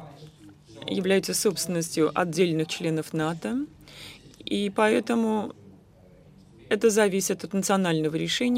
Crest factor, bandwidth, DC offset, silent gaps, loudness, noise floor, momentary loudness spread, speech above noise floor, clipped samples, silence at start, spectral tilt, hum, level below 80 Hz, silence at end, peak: 18 dB; 16 kHz; under 0.1%; none; -25 LUFS; -53 dBFS; 16 LU; 29 dB; under 0.1%; 0 s; -4.5 dB/octave; none; -62 dBFS; 0 s; -8 dBFS